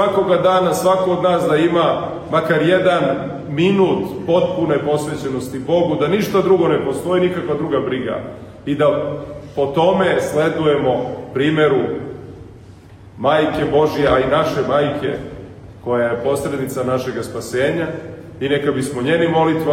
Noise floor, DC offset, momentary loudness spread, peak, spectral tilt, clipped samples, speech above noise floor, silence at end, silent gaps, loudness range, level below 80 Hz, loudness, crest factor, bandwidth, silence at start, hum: -40 dBFS; under 0.1%; 11 LU; -2 dBFS; -6 dB/octave; under 0.1%; 23 dB; 0 s; none; 4 LU; -46 dBFS; -17 LUFS; 14 dB; 16 kHz; 0 s; none